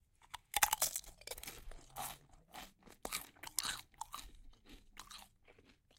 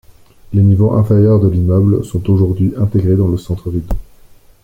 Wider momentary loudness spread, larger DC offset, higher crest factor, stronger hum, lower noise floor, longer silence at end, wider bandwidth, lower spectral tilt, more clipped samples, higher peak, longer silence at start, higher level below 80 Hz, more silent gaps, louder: first, 23 LU vs 10 LU; neither; first, 36 dB vs 12 dB; neither; first, -67 dBFS vs -42 dBFS; second, 0.25 s vs 0.6 s; first, 17 kHz vs 8.2 kHz; second, 0.5 dB/octave vs -10.5 dB/octave; neither; second, -10 dBFS vs -2 dBFS; second, 0.2 s vs 0.5 s; second, -62 dBFS vs -30 dBFS; neither; second, -40 LUFS vs -13 LUFS